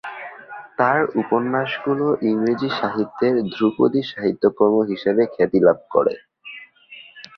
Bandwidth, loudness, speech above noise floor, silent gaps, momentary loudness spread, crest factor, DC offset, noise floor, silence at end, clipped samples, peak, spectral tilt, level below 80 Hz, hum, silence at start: 6.2 kHz; -20 LUFS; 26 dB; none; 19 LU; 18 dB; under 0.1%; -45 dBFS; 0.15 s; under 0.1%; -2 dBFS; -8 dB/octave; -62 dBFS; none; 0.05 s